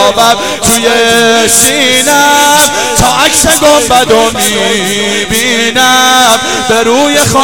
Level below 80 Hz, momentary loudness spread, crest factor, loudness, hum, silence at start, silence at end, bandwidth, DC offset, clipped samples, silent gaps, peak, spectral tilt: -32 dBFS; 5 LU; 8 dB; -6 LUFS; none; 0 s; 0 s; over 20 kHz; 2%; 1%; none; 0 dBFS; -1.5 dB/octave